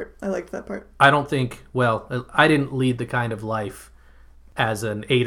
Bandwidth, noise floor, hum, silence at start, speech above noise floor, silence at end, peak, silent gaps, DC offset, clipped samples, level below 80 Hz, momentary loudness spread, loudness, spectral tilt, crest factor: 15 kHz; -48 dBFS; none; 0 s; 26 dB; 0 s; 0 dBFS; none; under 0.1%; under 0.1%; -50 dBFS; 15 LU; -22 LUFS; -6 dB/octave; 22 dB